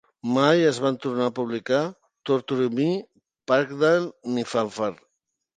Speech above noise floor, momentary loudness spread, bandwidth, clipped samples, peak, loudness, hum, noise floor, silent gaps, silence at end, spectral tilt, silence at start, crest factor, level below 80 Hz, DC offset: 55 dB; 10 LU; 9.6 kHz; under 0.1%; -4 dBFS; -24 LUFS; none; -78 dBFS; none; 0.65 s; -6 dB/octave; 0.25 s; 20 dB; -72 dBFS; under 0.1%